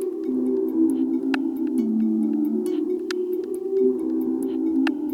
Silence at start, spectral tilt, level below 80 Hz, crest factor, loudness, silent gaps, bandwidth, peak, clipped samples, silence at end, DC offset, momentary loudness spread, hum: 0 s; -6.5 dB/octave; -68 dBFS; 14 dB; -24 LUFS; none; 15 kHz; -8 dBFS; under 0.1%; 0 s; under 0.1%; 5 LU; none